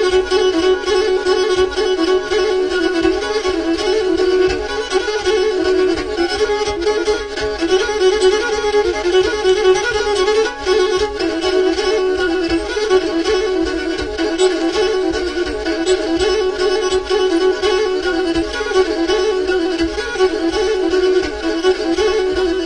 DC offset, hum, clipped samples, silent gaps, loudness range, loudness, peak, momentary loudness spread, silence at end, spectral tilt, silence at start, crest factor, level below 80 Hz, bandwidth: under 0.1%; none; under 0.1%; none; 2 LU; -16 LUFS; -2 dBFS; 4 LU; 0 s; -3.5 dB/octave; 0 s; 12 dB; -36 dBFS; 10.5 kHz